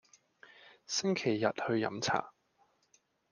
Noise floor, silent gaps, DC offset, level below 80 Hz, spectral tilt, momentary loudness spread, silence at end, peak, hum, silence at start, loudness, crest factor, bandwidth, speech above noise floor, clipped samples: -72 dBFS; none; under 0.1%; -78 dBFS; -4 dB/octave; 5 LU; 1 s; -14 dBFS; none; 0.65 s; -33 LUFS; 22 dB; 10.5 kHz; 40 dB; under 0.1%